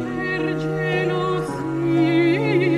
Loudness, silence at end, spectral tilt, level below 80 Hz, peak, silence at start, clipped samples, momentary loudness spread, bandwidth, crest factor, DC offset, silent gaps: -21 LUFS; 0 s; -7.5 dB/octave; -50 dBFS; -8 dBFS; 0 s; under 0.1%; 6 LU; 11.5 kHz; 12 dB; under 0.1%; none